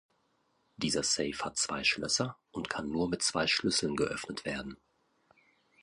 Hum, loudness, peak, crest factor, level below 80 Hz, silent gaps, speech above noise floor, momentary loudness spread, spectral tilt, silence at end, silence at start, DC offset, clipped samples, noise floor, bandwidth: none; -31 LUFS; -14 dBFS; 20 dB; -60 dBFS; none; 41 dB; 9 LU; -2.5 dB/octave; 1.1 s; 0.8 s; under 0.1%; under 0.1%; -74 dBFS; 11.5 kHz